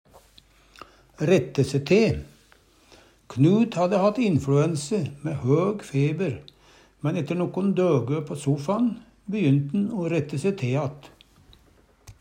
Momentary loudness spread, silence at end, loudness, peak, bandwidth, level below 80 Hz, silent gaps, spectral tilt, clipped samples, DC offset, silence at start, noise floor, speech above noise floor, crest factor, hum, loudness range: 9 LU; 0.1 s; -24 LUFS; -6 dBFS; 11 kHz; -56 dBFS; none; -7.5 dB/octave; under 0.1%; under 0.1%; 0.15 s; -58 dBFS; 35 dB; 18 dB; none; 3 LU